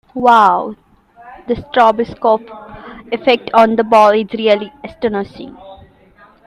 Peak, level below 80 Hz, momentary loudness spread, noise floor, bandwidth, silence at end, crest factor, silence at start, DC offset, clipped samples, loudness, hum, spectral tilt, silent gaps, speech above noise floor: 0 dBFS; -48 dBFS; 23 LU; -46 dBFS; 12 kHz; 0.7 s; 14 dB; 0.15 s; under 0.1%; under 0.1%; -13 LUFS; none; -5.5 dB/octave; none; 33 dB